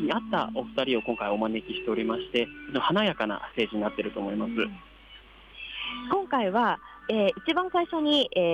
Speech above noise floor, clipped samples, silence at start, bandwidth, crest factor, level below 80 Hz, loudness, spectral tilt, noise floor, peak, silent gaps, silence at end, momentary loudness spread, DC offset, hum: 23 dB; under 0.1%; 0 s; 10 kHz; 14 dB; -58 dBFS; -28 LUFS; -6 dB/octave; -51 dBFS; -14 dBFS; none; 0 s; 8 LU; under 0.1%; none